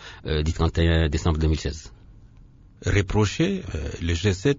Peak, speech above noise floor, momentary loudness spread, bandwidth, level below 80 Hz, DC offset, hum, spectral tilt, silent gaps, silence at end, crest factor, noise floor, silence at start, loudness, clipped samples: -6 dBFS; 27 dB; 10 LU; 7.8 kHz; -30 dBFS; under 0.1%; none; -6 dB/octave; none; 0 s; 18 dB; -49 dBFS; 0 s; -24 LUFS; under 0.1%